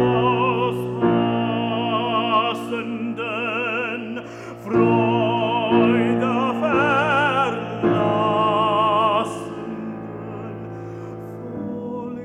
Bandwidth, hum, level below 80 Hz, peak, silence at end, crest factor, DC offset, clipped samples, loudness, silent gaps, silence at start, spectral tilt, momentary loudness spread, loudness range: 12 kHz; none; -56 dBFS; -6 dBFS; 0 s; 16 dB; under 0.1%; under 0.1%; -20 LUFS; none; 0 s; -7 dB/octave; 15 LU; 5 LU